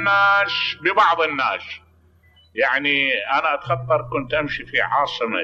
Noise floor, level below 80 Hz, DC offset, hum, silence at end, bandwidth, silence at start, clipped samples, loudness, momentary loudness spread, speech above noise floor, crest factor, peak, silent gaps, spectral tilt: -55 dBFS; -54 dBFS; under 0.1%; none; 0 s; 8 kHz; 0 s; under 0.1%; -19 LUFS; 7 LU; 35 dB; 16 dB; -4 dBFS; none; -5 dB/octave